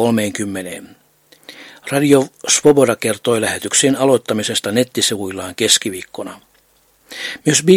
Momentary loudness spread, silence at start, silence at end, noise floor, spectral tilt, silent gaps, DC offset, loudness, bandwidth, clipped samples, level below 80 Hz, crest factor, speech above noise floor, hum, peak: 17 LU; 0 s; 0 s; -56 dBFS; -3.5 dB/octave; none; under 0.1%; -15 LUFS; 17 kHz; under 0.1%; -58 dBFS; 16 dB; 40 dB; none; 0 dBFS